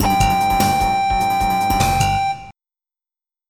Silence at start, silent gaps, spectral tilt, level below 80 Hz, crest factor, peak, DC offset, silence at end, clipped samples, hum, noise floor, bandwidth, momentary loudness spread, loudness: 0 s; none; -4 dB/octave; -30 dBFS; 14 dB; -4 dBFS; 0.3%; 1 s; under 0.1%; none; under -90 dBFS; 19 kHz; 4 LU; -17 LUFS